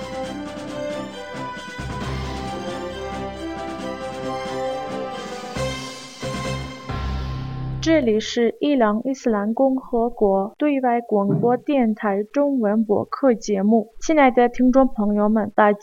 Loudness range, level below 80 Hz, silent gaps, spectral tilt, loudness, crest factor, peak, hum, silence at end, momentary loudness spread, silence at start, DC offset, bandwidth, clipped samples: 11 LU; -40 dBFS; none; -6 dB/octave; -22 LUFS; 20 dB; -2 dBFS; none; 0 s; 13 LU; 0 s; 0.2%; 11 kHz; under 0.1%